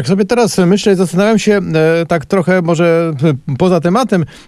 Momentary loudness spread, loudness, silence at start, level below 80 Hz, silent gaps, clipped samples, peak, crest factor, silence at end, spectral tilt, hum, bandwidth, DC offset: 3 LU; -12 LUFS; 0 s; -46 dBFS; none; under 0.1%; 0 dBFS; 12 dB; 0.1 s; -6.5 dB/octave; none; 13 kHz; under 0.1%